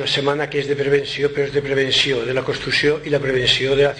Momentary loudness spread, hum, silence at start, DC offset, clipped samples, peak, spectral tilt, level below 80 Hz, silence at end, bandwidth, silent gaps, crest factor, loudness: 6 LU; none; 0 s; under 0.1%; under 0.1%; -4 dBFS; -4 dB/octave; -46 dBFS; 0 s; 9.8 kHz; none; 16 dB; -18 LUFS